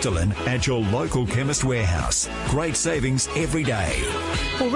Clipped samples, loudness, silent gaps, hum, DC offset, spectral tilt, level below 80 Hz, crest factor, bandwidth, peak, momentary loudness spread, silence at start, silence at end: under 0.1%; -23 LUFS; none; none; under 0.1%; -4.5 dB/octave; -34 dBFS; 14 dB; 11.5 kHz; -10 dBFS; 2 LU; 0 s; 0 s